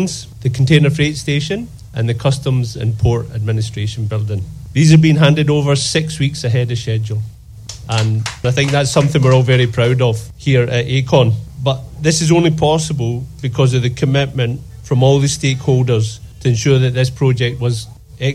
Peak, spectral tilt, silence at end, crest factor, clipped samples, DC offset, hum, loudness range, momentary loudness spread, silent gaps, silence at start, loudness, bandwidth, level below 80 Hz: 0 dBFS; -6 dB/octave; 0 s; 14 dB; under 0.1%; under 0.1%; none; 3 LU; 10 LU; none; 0 s; -15 LUFS; 12.5 kHz; -38 dBFS